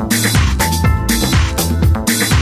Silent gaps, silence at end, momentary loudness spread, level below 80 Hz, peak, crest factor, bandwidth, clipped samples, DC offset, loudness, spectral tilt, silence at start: none; 0 s; 2 LU; -18 dBFS; -2 dBFS; 12 dB; 16 kHz; under 0.1%; under 0.1%; -14 LUFS; -4 dB/octave; 0 s